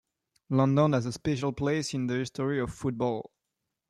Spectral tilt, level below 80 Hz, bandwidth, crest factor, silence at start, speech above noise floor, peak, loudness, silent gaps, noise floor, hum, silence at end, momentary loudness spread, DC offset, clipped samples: -6.5 dB/octave; -58 dBFS; 11.5 kHz; 18 dB; 0.5 s; 57 dB; -12 dBFS; -29 LUFS; none; -85 dBFS; none; 0.65 s; 8 LU; under 0.1%; under 0.1%